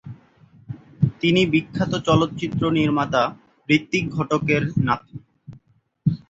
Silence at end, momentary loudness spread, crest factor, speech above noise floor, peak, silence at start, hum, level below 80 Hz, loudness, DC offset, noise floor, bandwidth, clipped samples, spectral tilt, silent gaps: 0.15 s; 20 LU; 20 dB; 37 dB; -2 dBFS; 0.05 s; none; -50 dBFS; -21 LUFS; under 0.1%; -57 dBFS; 7.8 kHz; under 0.1%; -6.5 dB/octave; none